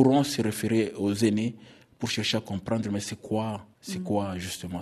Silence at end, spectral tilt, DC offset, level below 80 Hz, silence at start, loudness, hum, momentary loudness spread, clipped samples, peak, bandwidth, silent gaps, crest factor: 0 s; -5 dB/octave; under 0.1%; -60 dBFS; 0 s; -28 LUFS; none; 10 LU; under 0.1%; -6 dBFS; 13.5 kHz; none; 20 dB